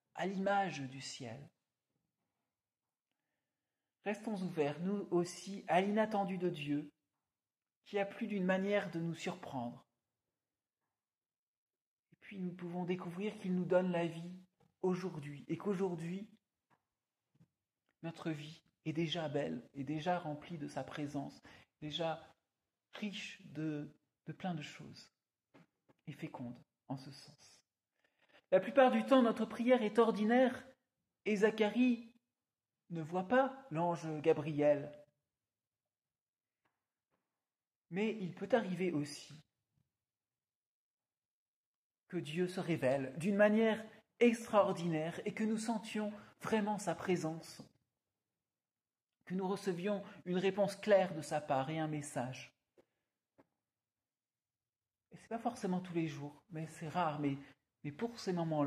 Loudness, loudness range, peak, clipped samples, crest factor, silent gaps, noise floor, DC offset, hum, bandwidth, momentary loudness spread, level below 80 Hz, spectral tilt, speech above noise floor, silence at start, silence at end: -37 LUFS; 14 LU; -16 dBFS; under 0.1%; 24 dB; 7.76-7.82 s, 11.38-11.67 s, 11.86-12.03 s, 36.21-36.33 s, 37.76-37.82 s, 40.55-40.98 s, 41.18-41.90 s; under -90 dBFS; under 0.1%; none; 14.5 kHz; 17 LU; -82 dBFS; -6 dB/octave; over 53 dB; 0.15 s; 0 s